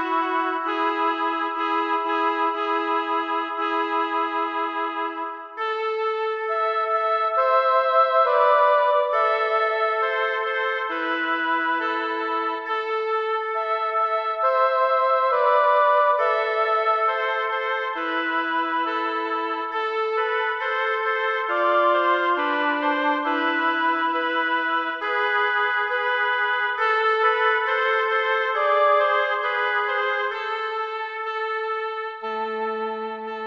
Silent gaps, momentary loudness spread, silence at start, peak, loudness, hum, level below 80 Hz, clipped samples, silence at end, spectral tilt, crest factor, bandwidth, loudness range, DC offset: none; 8 LU; 0 s; -8 dBFS; -22 LUFS; none; -76 dBFS; under 0.1%; 0 s; -3 dB/octave; 16 dB; 7.2 kHz; 5 LU; under 0.1%